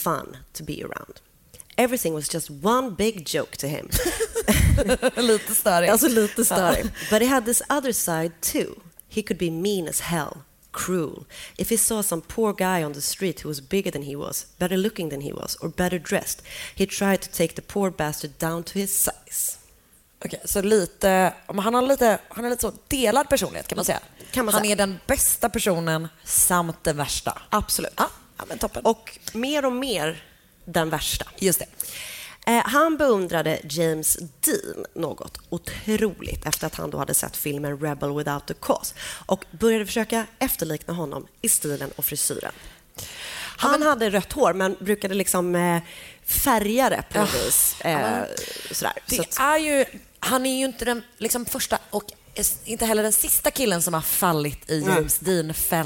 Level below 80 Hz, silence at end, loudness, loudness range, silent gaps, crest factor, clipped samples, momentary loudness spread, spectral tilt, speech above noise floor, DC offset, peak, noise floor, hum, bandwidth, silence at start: -42 dBFS; 0 s; -23 LUFS; 5 LU; none; 18 dB; under 0.1%; 12 LU; -3.5 dB/octave; 33 dB; under 0.1%; -6 dBFS; -57 dBFS; none; 17 kHz; 0 s